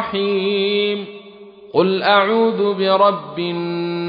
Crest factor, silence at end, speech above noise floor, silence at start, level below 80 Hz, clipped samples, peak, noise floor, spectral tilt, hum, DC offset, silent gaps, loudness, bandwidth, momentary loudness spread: 16 dB; 0 s; 23 dB; 0 s; -66 dBFS; under 0.1%; -2 dBFS; -40 dBFS; -8.5 dB/octave; none; under 0.1%; none; -17 LUFS; 5.2 kHz; 10 LU